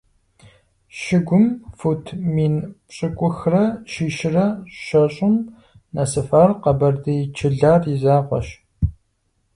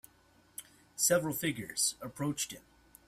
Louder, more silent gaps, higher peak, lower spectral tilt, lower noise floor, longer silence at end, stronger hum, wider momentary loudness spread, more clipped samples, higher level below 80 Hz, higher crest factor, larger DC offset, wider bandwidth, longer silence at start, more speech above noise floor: first, -19 LUFS vs -32 LUFS; neither; first, -2 dBFS vs -14 dBFS; first, -7.5 dB/octave vs -3 dB/octave; about the same, -67 dBFS vs -65 dBFS; first, 0.65 s vs 0.5 s; neither; second, 11 LU vs 20 LU; neither; first, -40 dBFS vs -68 dBFS; about the same, 18 dB vs 22 dB; neither; second, 11 kHz vs 16 kHz; first, 0.95 s vs 0.6 s; first, 49 dB vs 32 dB